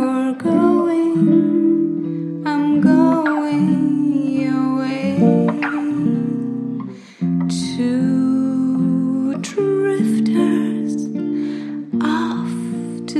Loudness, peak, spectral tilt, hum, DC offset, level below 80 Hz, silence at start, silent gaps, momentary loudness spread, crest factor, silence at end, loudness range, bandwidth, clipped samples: -18 LUFS; 0 dBFS; -7.5 dB/octave; none; under 0.1%; -64 dBFS; 0 s; none; 9 LU; 16 dB; 0 s; 3 LU; 11.5 kHz; under 0.1%